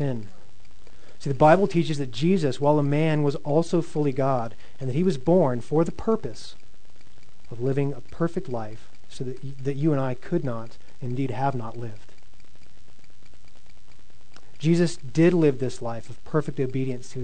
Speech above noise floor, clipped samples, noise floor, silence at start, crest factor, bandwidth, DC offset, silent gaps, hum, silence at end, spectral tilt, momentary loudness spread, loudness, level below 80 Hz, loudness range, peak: 31 dB; under 0.1%; -56 dBFS; 0 s; 22 dB; 9.4 kHz; 4%; none; none; 0 s; -7.5 dB/octave; 16 LU; -25 LUFS; -54 dBFS; 10 LU; -4 dBFS